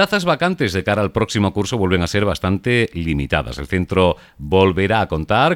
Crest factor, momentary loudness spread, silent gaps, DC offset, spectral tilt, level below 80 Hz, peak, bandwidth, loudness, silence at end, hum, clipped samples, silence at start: 16 dB; 5 LU; none; under 0.1%; -6 dB/octave; -36 dBFS; -2 dBFS; 16.5 kHz; -18 LUFS; 0 s; none; under 0.1%; 0 s